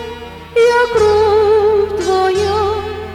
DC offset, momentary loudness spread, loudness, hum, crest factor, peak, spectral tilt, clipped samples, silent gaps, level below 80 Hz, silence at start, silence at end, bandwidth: under 0.1%; 9 LU; -13 LUFS; none; 10 dB; -4 dBFS; -5 dB/octave; under 0.1%; none; -38 dBFS; 0 s; 0 s; 12.5 kHz